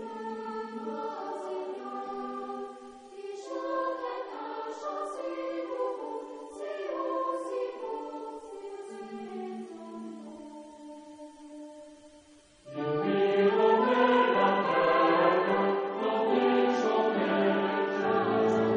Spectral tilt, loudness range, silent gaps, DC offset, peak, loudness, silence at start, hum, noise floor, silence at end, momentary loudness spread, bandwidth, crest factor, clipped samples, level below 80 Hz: -6 dB/octave; 18 LU; none; under 0.1%; -12 dBFS; -29 LUFS; 0 s; none; -57 dBFS; 0 s; 21 LU; 10 kHz; 18 dB; under 0.1%; -74 dBFS